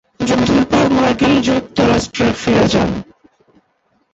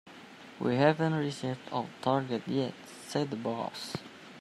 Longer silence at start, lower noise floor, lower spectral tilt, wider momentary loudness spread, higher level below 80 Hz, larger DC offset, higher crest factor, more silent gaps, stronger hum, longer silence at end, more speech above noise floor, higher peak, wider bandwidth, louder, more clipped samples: first, 0.2 s vs 0.05 s; first, -61 dBFS vs -50 dBFS; about the same, -5.5 dB/octave vs -6 dB/octave; second, 4 LU vs 20 LU; first, -36 dBFS vs -74 dBFS; neither; second, 14 dB vs 22 dB; neither; neither; first, 1.1 s vs 0 s; first, 48 dB vs 19 dB; first, -2 dBFS vs -10 dBFS; second, 8.2 kHz vs 14.5 kHz; first, -14 LUFS vs -32 LUFS; neither